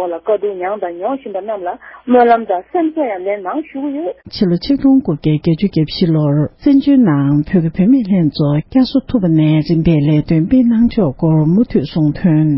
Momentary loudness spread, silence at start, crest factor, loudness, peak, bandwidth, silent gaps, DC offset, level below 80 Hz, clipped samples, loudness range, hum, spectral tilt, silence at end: 10 LU; 0 s; 12 dB; -14 LUFS; 0 dBFS; 5.8 kHz; none; under 0.1%; -38 dBFS; under 0.1%; 4 LU; none; -12.5 dB/octave; 0 s